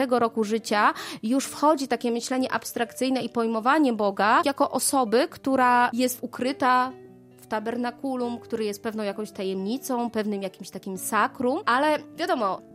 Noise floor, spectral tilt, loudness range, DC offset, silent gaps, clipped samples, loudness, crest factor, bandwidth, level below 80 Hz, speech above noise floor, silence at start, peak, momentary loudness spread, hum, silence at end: -49 dBFS; -3.5 dB/octave; 7 LU; under 0.1%; none; under 0.1%; -25 LUFS; 18 dB; 16 kHz; -70 dBFS; 24 dB; 0 s; -8 dBFS; 9 LU; none; 0.15 s